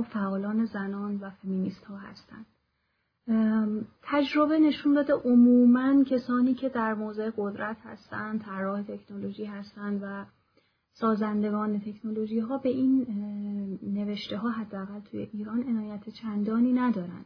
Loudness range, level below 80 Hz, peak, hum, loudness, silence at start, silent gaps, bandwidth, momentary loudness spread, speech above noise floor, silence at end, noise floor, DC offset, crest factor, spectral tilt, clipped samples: 11 LU; -68 dBFS; -12 dBFS; none; -28 LUFS; 0 s; none; 5.4 kHz; 16 LU; 49 dB; 0 s; -76 dBFS; under 0.1%; 16 dB; -8.5 dB/octave; under 0.1%